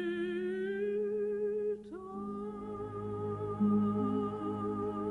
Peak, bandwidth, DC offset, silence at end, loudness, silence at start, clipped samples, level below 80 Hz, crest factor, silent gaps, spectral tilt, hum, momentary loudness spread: -20 dBFS; 9 kHz; under 0.1%; 0 s; -35 LUFS; 0 s; under 0.1%; -64 dBFS; 14 dB; none; -9 dB/octave; none; 11 LU